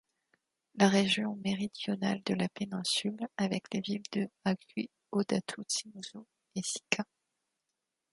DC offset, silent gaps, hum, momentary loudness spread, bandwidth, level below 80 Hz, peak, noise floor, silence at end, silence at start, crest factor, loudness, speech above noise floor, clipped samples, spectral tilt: under 0.1%; none; none; 13 LU; 11.5 kHz; -74 dBFS; -8 dBFS; -87 dBFS; 1.1 s; 0.75 s; 26 dB; -33 LUFS; 54 dB; under 0.1%; -4 dB/octave